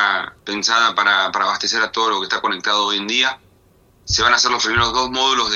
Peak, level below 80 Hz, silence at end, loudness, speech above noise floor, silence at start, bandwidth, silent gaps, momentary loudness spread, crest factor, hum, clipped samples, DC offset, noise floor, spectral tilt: 0 dBFS; -44 dBFS; 0 s; -17 LUFS; 36 dB; 0 s; 7.6 kHz; none; 6 LU; 18 dB; none; under 0.1%; under 0.1%; -54 dBFS; -1.5 dB/octave